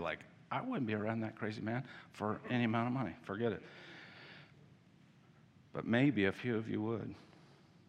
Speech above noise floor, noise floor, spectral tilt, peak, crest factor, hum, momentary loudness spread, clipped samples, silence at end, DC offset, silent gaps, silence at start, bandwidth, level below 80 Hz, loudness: 27 dB; -64 dBFS; -8 dB/octave; -18 dBFS; 20 dB; none; 20 LU; under 0.1%; 0.65 s; under 0.1%; none; 0 s; 9.4 kHz; -76 dBFS; -38 LUFS